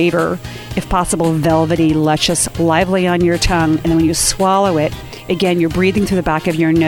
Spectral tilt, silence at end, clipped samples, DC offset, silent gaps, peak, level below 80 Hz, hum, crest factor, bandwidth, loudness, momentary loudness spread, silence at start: -4.5 dB/octave; 0 s; under 0.1%; under 0.1%; none; 0 dBFS; -32 dBFS; none; 14 dB; 18 kHz; -15 LUFS; 6 LU; 0 s